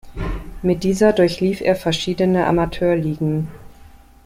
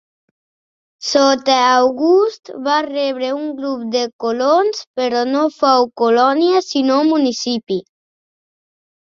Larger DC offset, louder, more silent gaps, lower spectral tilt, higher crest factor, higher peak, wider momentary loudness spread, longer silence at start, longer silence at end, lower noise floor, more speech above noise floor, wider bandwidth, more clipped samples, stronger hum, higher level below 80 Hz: neither; second, -19 LUFS vs -16 LUFS; second, none vs 4.13-4.19 s, 4.87-4.94 s; first, -6.5 dB/octave vs -3 dB/octave; about the same, 18 dB vs 16 dB; about the same, -2 dBFS vs -2 dBFS; first, 12 LU vs 8 LU; second, 0.05 s vs 1 s; second, 0.55 s vs 1.3 s; second, -44 dBFS vs under -90 dBFS; second, 27 dB vs over 75 dB; first, 16 kHz vs 7.6 kHz; neither; neither; first, -36 dBFS vs -66 dBFS